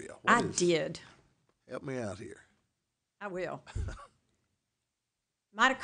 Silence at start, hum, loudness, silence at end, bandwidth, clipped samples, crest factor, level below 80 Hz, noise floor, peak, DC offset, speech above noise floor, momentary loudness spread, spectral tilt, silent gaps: 0 s; none; -32 LUFS; 0 s; 10 kHz; under 0.1%; 26 dB; -52 dBFS; -87 dBFS; -10 dBFS; under 0.1%; 55 dB; 20 LU; -4 dB/octave; none